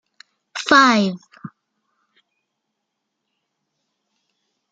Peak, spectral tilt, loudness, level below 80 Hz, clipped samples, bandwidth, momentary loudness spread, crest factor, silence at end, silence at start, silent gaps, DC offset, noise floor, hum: 0 dBFS; -4 dB/octave; -15 LUFS; -70 dBFS; under 0.1%; 9 kHz; 21 LU; 22 dB; 3.25 s; 0.55 s; none; under 0.1%; -78 dBFS; none